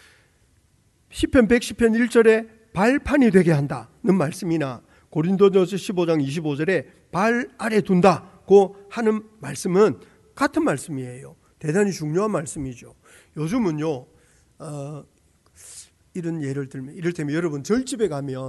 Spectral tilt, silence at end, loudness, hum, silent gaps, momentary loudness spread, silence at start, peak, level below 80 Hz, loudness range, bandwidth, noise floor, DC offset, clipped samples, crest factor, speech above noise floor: -6.5 dB/octave; 0 s; -21 LUFS; none; none; 17 LU; 1.1 s; -2 dBFS; -48 dBFS; 11 LU; 12 kHz; -61 dBFS; under 0.1%; under 0.1%; 20 dB; 40 dB